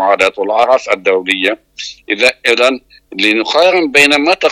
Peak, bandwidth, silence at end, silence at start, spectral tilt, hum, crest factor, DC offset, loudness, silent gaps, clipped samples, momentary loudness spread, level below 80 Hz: 0 dBFS; 16 kHz; 0 s; 0 s; -2 dB/octave; none; 12 dB; under 0.1%; -11 LUFS; none; 0.2%; 14 LU; -54 dBFS